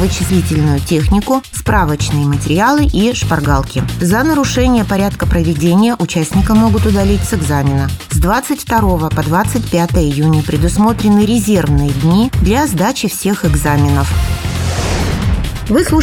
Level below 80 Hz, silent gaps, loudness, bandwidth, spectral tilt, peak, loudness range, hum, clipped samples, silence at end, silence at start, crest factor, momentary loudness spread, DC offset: -22 dBFS; none; -13 LUFS; 18 kHz; -6 dB/octave; 0 dBFS; 2 LU; none; under 0.1%; 0 s; 0 s; 12 dB; 5 LU; 0.1%